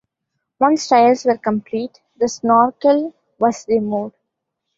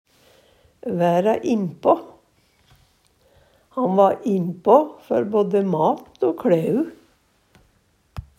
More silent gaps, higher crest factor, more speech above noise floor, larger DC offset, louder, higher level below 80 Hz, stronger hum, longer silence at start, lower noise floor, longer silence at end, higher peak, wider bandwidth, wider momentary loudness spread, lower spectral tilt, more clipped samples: neither; second, 16 dB vs 22 dB; first, 61 dB vs 43 dB; neither; first, -17 LUFS vs -20 LUFS; second, -62 dBFS vs -56 dBFS; neither; second, 0.6 s vs 0.85 s; first, -77 dBFS vs -62 dBFS; first, 0.7 s vs 0.15 s; about the same, -2 dBFS vs 0 dBFS; second, 7.8 kHz vs 15.5 kHz; about the same, 13 LU vs 12 LU; second, -5 dB/octave vs -8 dB/octave; neither